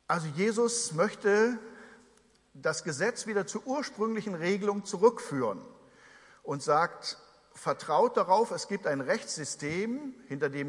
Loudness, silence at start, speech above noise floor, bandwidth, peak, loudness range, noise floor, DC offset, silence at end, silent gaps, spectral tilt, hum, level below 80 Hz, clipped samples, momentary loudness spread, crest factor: -30 LUFS; 0.1 s; 34 dB; 11.5 kHz; -10 dBFS; 2 LU; -64 dBFS; under 0.1%; 0 s; none; -4 dB/octave; none; -76 dBFS; under 0.1%; 12 LU; 22 dB